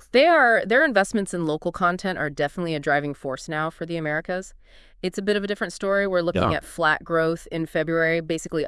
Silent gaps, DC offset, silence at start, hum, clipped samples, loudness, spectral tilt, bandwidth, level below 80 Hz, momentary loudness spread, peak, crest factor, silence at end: none; under 0.1%; 0.15 s; none; under 0.1%; -23 LUFS; -5 dB/octave; 12 kHz; -50 dBFS; 11 LU; -4 dBFS; 18 dB; 0 s